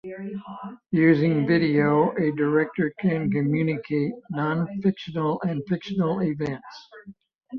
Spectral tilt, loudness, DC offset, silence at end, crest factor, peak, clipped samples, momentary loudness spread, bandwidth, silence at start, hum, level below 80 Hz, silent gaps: -9 dB/octave; -24 LUFS; under 0.1%; 0 s; 18 dB; -6 dBFS; under 0.1%; 15 LU; 6.4 kHz; 0.05 s; none; -62 dBFS; none